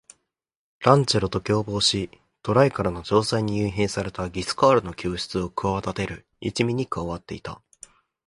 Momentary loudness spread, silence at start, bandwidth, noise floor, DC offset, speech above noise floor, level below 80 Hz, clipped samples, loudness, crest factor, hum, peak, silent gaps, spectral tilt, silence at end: 13 LU; 0.8 s; 11.5 kHz; -81 dBFS; under 0.1%; 57 dB; -46 dBFS; under 0.1%; -24 LUFS; 24 dB; none; 0 dBFS; none; -5 dB/octave; 0.7 s